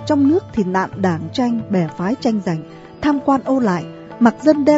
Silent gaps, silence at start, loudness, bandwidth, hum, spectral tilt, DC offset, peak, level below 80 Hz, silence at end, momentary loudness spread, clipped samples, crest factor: none; 0 s; -18 LUFS; 8 kHz; none; -7 dB/octave; under 0.1%; 0 dBFS; -50 dBFS; 0 s; 9 LU; under 0.1%; 16 dB